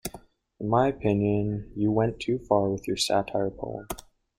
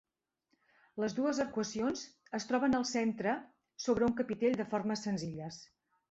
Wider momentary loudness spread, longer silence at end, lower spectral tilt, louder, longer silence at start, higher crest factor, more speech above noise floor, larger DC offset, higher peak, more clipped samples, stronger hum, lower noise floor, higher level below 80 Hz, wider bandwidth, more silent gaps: about the same, 13 LU vs 11 LU; about the same, 0.4 s vs 0.5 s; about the same, -5.5 dB/octave vs -5 dB/octave; first, -27 LUFS vs -35 LUFS; second, 0.05 s vs 0.95 s; about the same, 20 dB vs 16 dB; second, 24 dB vs 47 dB; neither; first, -6 dBFS vs -18 dBFS; neither; neither; second, -50 dBFS vs -81 dBFS; first, -50 dBFS vs -66 dBFS; first, 16.5 kHz vs 8.2 kHz; neither